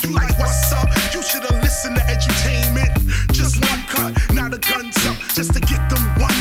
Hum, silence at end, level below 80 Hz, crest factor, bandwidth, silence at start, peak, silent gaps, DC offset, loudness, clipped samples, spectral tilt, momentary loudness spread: none; 0 s; -20 dBFS; 12 dB; 16.5 kHz; 0 s; -6 dBFS; none; under 0.1%; -18 LUFS; under 0.1%; -4 dB/octave; 2 LU